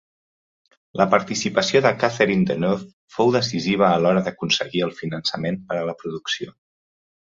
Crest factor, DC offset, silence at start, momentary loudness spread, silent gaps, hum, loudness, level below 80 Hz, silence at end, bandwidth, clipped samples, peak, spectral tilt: 20 dB; under 0.1%; 0.95 s; 10 LU; 2.93-3.08 s; none; -21 LUFS; -58 dBFS; 0.8 s; 7.8 kHz; under 0.1%; -2 dBFS; -5 dB/octave